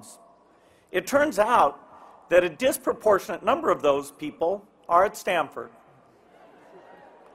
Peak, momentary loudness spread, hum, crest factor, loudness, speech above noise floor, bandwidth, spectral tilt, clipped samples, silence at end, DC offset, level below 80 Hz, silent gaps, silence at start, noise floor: -6 dBFS; 11 LU; none; 20 dB; -24 LUFS; 35 dB; 16 kHz; -4 dB/octave; under 0.1%; 1.65 s; under 0.1%; -60 dBFS; none; 0.05 s; -58 dBFS